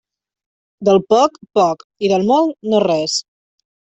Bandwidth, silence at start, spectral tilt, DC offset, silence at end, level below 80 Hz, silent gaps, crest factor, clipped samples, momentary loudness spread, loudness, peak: 8.2 kHz; 0.8 s; -5 dB/octave; under 0.1%; 0.75 s; -60 dBFS; 1.84-1.90 s; 14 dB; under 0.1%; 7 LU; -16 LUFS; -2 dBFS